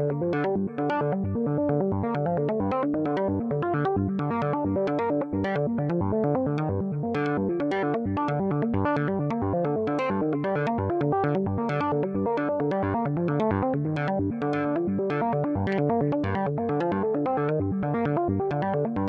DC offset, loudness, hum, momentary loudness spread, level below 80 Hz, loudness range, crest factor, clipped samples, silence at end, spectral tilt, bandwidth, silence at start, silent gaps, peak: under 0.1%; -26 LUFS; none; 2 LU; -58 dBFS; 1 LU; 12 dB; under 0.1%; 0 s; -9.5 dB/octave; 6.8 kHz; 0 s; none; -14 dBFS